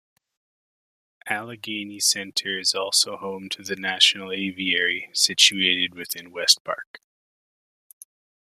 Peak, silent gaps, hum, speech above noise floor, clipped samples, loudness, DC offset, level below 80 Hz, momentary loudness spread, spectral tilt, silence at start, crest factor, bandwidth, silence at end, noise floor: -2 dBFS; 6.60-6.65 s, 6.87-6.94 s; none; over 66 dB; under 0.1%; -21 LUFS; under 0.1%; -74 dBFS; 16 LU; -0.5 dB/octave; 1.25 s; 24 dB; 15 kHz; 1.5 s; under -90 dBFS